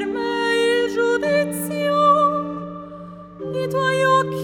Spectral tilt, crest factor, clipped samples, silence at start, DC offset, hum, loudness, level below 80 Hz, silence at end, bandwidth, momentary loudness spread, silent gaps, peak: -4.5 dB/octave; 16 dB; under 0.1%; 0 s; under 0.1%; none; -19 LUFS; -56 dBFS; 0 s; 17 kHz; 18 LU; none; -4 dBFS